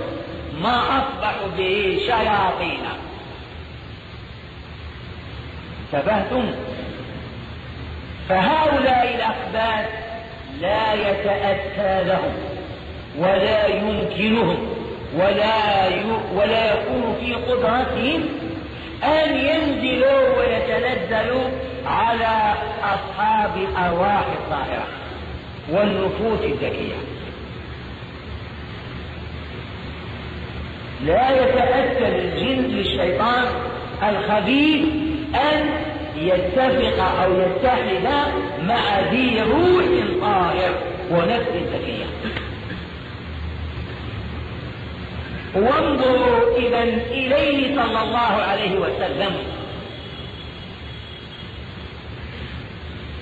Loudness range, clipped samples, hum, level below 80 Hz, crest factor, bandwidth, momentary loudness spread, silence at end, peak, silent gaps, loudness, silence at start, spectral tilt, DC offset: 10 LU; under 0.1%; none; -38 dBFS; 16 dB; 8 kHz; 17 LU; 0 s; -6 dBFS; none; -20 LUFS; 0 s; -7 dB/octave; under 0.1%